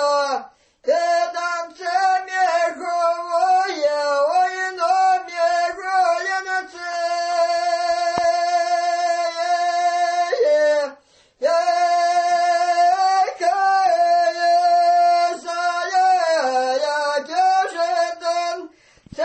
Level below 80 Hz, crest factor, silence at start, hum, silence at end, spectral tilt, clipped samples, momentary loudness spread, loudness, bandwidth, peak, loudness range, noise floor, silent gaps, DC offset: -66 dBFS; 16 dB; 0 s; none; 0 s; -1 dB/octave; under 0.1%; 7 LU; -19 LUFS; 8.8 kHz; -4 dBFS; 3 LU; -50 dBFS; none; under 0.1%